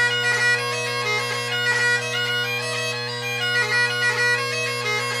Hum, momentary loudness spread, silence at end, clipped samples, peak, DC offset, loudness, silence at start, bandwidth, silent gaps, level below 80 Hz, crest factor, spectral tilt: none; 5 LU; 0 s; under 0.1%; -8 dBFS; under 0.1%; -21 LUFS; 0 s; 15.5 kHz; none; -70 dBFS; 14 dB; -2 dB/octave